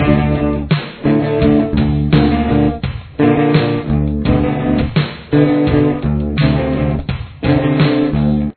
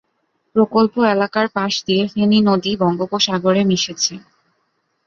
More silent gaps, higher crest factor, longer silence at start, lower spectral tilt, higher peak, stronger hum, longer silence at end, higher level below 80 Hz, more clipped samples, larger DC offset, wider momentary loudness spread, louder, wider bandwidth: neither; about the same, 14 dB vs 16 dB; second, 0 s vs 0.55 s; first, -11.5 dB/octave vs -4.5 dB/octave; about the same, 0 dBFS vs -2 dBFS; neither; second, 0.05 s vs 0.9 s; first, -26 dBFS vs -58 dBFS; neither; neither; about the same, 5 LU vs 5 LU; about the same, -15 LUFS vs -17 LUFS; second, 4.5 kHz vs 7.6 kHz